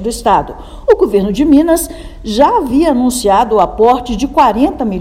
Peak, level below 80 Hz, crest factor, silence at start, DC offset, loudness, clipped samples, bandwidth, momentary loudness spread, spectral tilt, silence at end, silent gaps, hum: 0 dBFS; -30 dBFS; 12 dB; 0 s; under 0.1%; -11 LUFS; 0.8%; 16 kHz; 7 LU; -5 dB/octave; 0 s; none; none